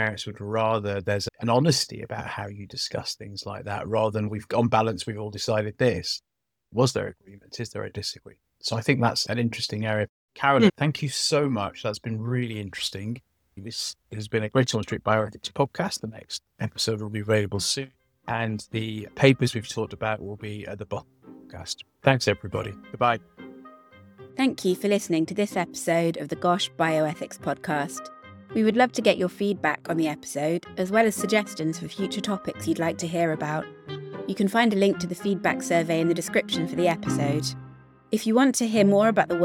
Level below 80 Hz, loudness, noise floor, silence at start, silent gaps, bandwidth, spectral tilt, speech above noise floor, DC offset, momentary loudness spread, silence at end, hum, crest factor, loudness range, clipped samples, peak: -60 dBFS; -26 LUFS; -51 dBFS; 0 s; 10.09-10.28 s; 18 kHz; -5 dB/octave; 26 dB; under 0.1%; 14 LU; 0 s; none; 24 dB; 4 LU; under 0.1%; -2 dBFS